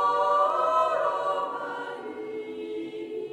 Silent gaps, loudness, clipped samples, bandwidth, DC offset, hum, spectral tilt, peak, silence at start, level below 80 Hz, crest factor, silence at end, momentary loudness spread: none; -27 LUFS; under 0.1%; 11.5 kHz; under 0.1%; none; -4 dB/octave; -12 dBFS; 0 s; -82 dBFS; 14 dB; 0 s; 13 LU